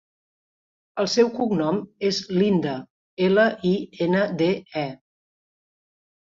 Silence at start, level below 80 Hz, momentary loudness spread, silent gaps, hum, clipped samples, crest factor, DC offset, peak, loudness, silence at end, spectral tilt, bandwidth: 0.95 s; -64 dBFS; 11 LU; 2.90-3.17 s; none; under 0.1%; 18 dB; under 0.1%; -6 dBFS; -23 LUFS; 1.45 s; -6 dB/octave; 7.6 kHz